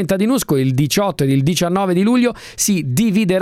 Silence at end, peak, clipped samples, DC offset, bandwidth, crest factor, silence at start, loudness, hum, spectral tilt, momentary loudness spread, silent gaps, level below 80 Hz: 0 s; 0 dBFS; under 0.1%; under 0.1%; 17 kHz; 14 dB; 0 s; -16 LUFS; none; -5 dB/octave; 2 LU; none; -46 dBFS